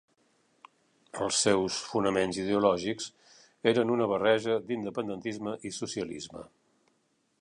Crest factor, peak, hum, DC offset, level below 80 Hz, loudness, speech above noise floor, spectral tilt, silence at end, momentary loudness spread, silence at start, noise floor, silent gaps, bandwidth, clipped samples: 22 dB; -10 dBFS; none; under 0.1%; -66 dBFS; -29 LUFS; 44 dB; -4 dB/octave; 0.95 s; 12 LU; 1.15 s; -73 dBFS; none; 11 kHz; under 0.1%